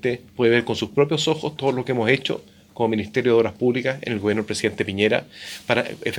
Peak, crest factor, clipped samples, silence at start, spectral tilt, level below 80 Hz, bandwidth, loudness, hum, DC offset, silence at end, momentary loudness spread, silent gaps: -2 dBFS; 20 dB; under 0.1%; 0.05 s; -5 dB/octave; -60 dBFS; 19.5 kHz; -22 LUFS; none; under 0.1%; 0 s; 7 LU; none